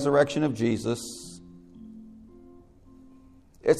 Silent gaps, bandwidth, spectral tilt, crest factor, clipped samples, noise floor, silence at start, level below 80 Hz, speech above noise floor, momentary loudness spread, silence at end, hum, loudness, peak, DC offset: none; 13.5 kHz; -5.5 dB/octave; 22 dB; under 0.1%; -54 dBFS; 0 s; -58 dBFS; 28 dB; 27 LU; 0 s; none; -27 LUFS; -6 dBFS; under 0.1%